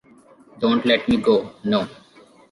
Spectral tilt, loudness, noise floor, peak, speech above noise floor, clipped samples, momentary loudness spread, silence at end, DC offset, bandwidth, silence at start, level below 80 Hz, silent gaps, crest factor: -6.5 dB/octave; -20 LUFS; -51 dBFS; -4 dBFS; 31 dB; under 0.1%; 6 LU; 0.6 s; under 0.1%; 11.5 kHz; 0.55 s; -54 dBFS; none; 18 dB